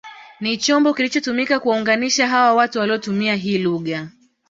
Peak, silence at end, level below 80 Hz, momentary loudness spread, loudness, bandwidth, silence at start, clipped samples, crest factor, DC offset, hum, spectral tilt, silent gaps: -4 dBFS; 0.4 s; -64 dBFS; 10 LU; -18 LUFS; 7.8 kHz; 0.05 s; under 0.1%; 16 dB; under 0.1%; none; -3.5 dB/octave; none